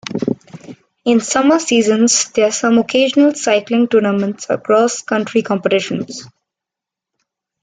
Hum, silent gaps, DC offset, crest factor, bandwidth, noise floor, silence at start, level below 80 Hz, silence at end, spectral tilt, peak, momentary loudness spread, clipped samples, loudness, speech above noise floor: none; none; under 0.1%; 14 dB; 9.6 kHz; -85 dBFS; 0.1 s; -60 dBFS; 1.35 s; -3.5 dB/octave; 0 dBFS; 10 LU; under 0.1%; -15 LUFS; 71 dB